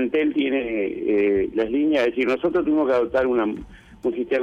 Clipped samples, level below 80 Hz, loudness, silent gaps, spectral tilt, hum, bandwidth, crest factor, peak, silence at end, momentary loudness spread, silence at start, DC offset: under 0.1%; -50 dBFS; -22 LUFS; none; -6.5 dB/octave; none; 7.4 kHz; 10 dB; -12 dBFS; 0 s; 7 LU; 0 s; under 0.1%